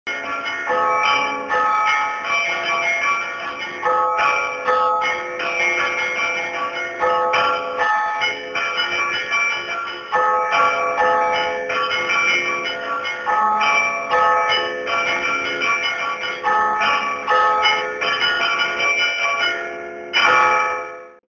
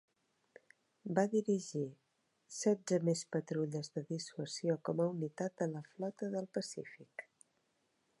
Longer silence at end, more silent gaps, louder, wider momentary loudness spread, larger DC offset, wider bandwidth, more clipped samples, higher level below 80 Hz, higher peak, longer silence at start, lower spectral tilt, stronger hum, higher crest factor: second, 0.25 s vs 0.95 s; neither; first, -18 LUFS vs -38 LUFS; second, 7 LU vs 14 LU; neither; second, 7.4 kHz vs 11.5 kHz; neither; first, -58 dBFS vs -88 dBFS; first, -2 dBFS vs -18 dBFS; second, 0.05 s vs 1.05 s; second, -1.5 dB/octave vs -5.5 dB/octave; neither; about the same, 18 dB vs 22 dB